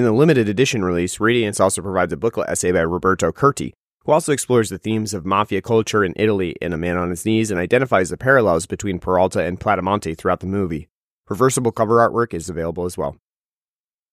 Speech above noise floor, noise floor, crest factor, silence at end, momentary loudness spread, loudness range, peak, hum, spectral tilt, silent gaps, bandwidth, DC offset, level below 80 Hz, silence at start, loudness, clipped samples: over 72 dB; under -90 dBFS; 18 dB; 1 s; 9 LU; 2 LU; -2 dBFS; none; -5 dB/octave; 3.75-3.88 s, 3.94-3.98 s, 10.90-11.24 s; 15.5 kHz; under 0.1%; -46 dBFS; 0 s; -19 LUFS; under 0.1%